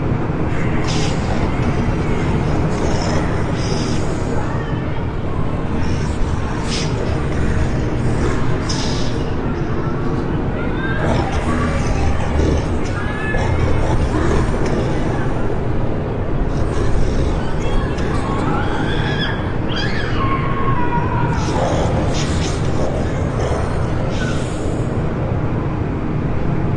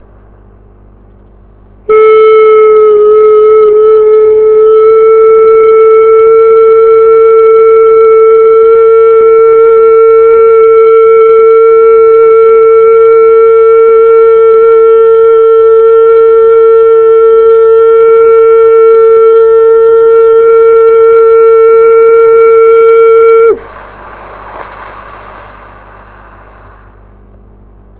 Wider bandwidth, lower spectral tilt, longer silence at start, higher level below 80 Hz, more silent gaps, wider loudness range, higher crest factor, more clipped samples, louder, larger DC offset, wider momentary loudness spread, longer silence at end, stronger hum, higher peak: first, 10.5 kHz vs 4 kHz; second, -6.5 dB/octave vs -8 dB/octave; second, 0 s vs 1.9 s; first, -24 dBFS vs -40 dBFS; neither; about the same, 2 LU vs 2 LU; first, 14 dB vs 4 dB; second, under 0.1% vs 0.7%; second, -20 LUFS vs -3 LUFS; neither; about the same, 3 LU vs 1 LU; second, 0 s vs 2.8 s; neither; about the same, -2 dBFS vs 0 dBFS